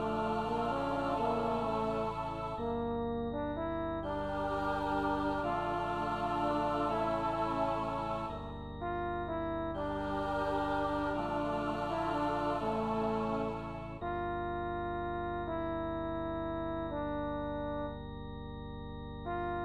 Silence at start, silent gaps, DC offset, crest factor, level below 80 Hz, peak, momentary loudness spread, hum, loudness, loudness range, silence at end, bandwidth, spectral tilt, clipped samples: 0 s; none; 0.2%; 14 dB; -50 dBFS; -20 dBFS; 7 LU; none; -36 LUFS; 4 LU; 0 s; 12.5 kHz; -7.5 dB/octave; under 0.1%